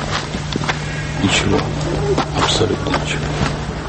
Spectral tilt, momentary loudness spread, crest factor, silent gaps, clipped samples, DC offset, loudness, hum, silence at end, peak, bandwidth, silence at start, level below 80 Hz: -4.5 dB/octave; 6 LU; 16 dB; none; under 0.1%; under 0.1%; -18 LUFS; none; 0 s; -2 dBFS; 8.8 kHz; 0 s; -30 dBFS